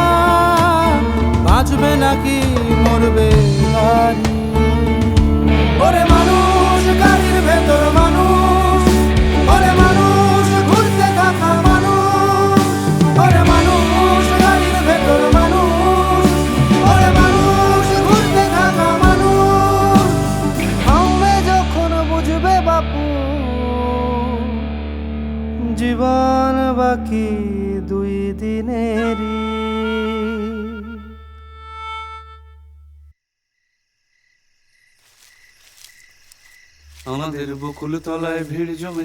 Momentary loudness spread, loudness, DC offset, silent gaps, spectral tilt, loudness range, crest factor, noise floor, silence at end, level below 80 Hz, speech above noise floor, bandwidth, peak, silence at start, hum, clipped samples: 12 LU; -14 LUFS; under 0.1%; none; -6 dB/octave; 12 LU; 14 dB; -74 dBFS; 0 s; -22 dBFS; 59 dB; 18.5 kHz; 0 dBFS; 0 s; none; under 0.1%